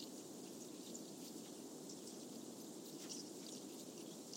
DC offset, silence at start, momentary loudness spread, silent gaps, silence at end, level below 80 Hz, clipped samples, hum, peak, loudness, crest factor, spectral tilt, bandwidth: under 0.1%; 0 s; 3 LU; none; 0 s; under -90 dBFS; under 0.1%; none; -36 dBFS; -52 LUFS; 16 dB; -3 dB/octave; 16 kHz